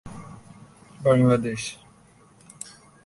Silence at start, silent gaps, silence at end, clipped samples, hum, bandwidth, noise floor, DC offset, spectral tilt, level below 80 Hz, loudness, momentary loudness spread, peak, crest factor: 0.05 s; none; 1.3 s; under 0.1%; none; 11.5 kHz; -55 dBFS; under 0.1%; -6.5 dB/octave; -56 dBFS; -22 LUFS; 26 LU; -8 dBFS; 20 dB